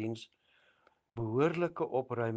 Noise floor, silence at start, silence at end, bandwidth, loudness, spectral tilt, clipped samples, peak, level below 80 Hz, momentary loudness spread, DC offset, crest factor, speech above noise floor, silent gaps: -70 dBFS; 0 s; 0 s; 9 kHz; -34 LUFS; -8 dB/octave; under 0.1%; -16 dBFS; -72 dBFS; 17 LU; under 0.1%; 18 dB; 37 dB; none